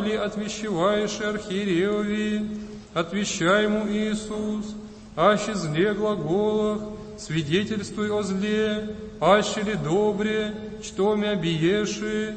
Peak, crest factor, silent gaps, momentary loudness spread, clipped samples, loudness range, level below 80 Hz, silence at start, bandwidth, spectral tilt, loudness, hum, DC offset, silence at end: -4 dBFS; 20 dB; none; 11 LU; under 0.1%; 2 LU; -50 dBFS; 0 s; 8.8 kHz; -5 dB/octave; -25 LUFS; none; under 0.1%; 0 s